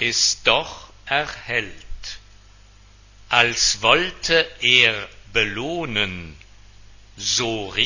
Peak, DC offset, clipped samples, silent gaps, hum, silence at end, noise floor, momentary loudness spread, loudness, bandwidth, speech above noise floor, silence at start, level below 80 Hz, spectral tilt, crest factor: 0 dBFS; under 0.1%; under 0.1%; none; 50 Hz at -50 dBFS; 0 s; -49 dBFS; 20 LU; -19 LUFS; 7.4 kHz; 28 dB; 0 s; -46 dBFS; -1.5 dB/octave; 22 dB